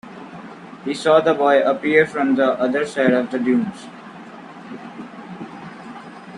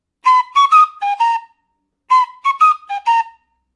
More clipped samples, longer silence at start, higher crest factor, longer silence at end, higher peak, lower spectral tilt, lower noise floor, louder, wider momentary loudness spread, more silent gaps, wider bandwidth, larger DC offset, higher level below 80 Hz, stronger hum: neither; second, 0.05 s vs 0.25 s; first, 20 dB vs 14 dB; second, 0 s vs 0.45 s; about the same, -2 dBFS vs -2 dBFS; first, -6 dB/octave vs 4 dB/octave; second, -38 dBFS vs -69 dBFS; second, -18 LUFS vs -14 LUFS; first, 22 LU vs 8 LU; neither; about the same, 11 kHz vs 11 kHz; neither; first, -62 dBFS vs -74 dBFS; neither